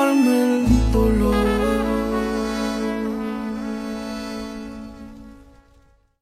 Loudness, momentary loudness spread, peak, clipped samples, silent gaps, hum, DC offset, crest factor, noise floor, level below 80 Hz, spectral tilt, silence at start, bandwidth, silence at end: -21 LUFS; 16 LU; -6 dBFS; under 0.1%; none; none; under 0.1%; 16 dB; -55 dBFS; -30 dBFS; -6.5 dB/octave; 0 s; 15.5 kHz; 0.8 s